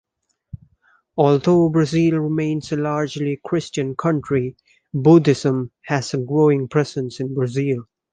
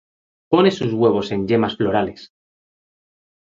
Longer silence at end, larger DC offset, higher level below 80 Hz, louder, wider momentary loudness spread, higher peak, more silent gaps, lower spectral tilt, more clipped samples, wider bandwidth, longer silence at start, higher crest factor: second, 0.3 s vs 1.2 s; neither; about the same, -54 dBFS vs -52 dBFS; about the same, -19 LUFS vs -19 LUFS; first, 11 LU vs 6 LU; about the same, -2 dBFS vs -2 dBFS; neither; about the same, -7 dB/octave vs -7 dB/octave; neither; first, 9.6 kHz vs 7.6 kHz; about the same, 0.55 s vs 0.5 s; about the same, 18 dB vs 18 dB